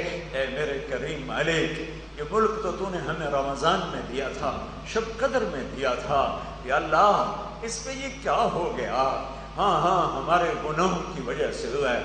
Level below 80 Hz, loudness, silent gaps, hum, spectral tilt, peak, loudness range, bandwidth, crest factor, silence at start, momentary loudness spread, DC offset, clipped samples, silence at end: -44 dBFS; -26 LUFS; none; none; -4.5 dB/octave; -8 dBFS; 3 LU; 10 kHz; 18 dB; 0 s; 9 LU; under 0.1%; under 0.1%; 0 s